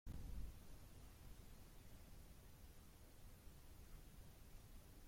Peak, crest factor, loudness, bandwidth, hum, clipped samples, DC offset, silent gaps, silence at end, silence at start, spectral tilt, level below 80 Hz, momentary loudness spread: -40 dBFS; 18 dB; -63 LUFS; 16.5 kHz; none; under 0.1%; under 0.1%; none; 0 s; 0.05 s; -5 dB/octave; -60 dBFS; 8 LU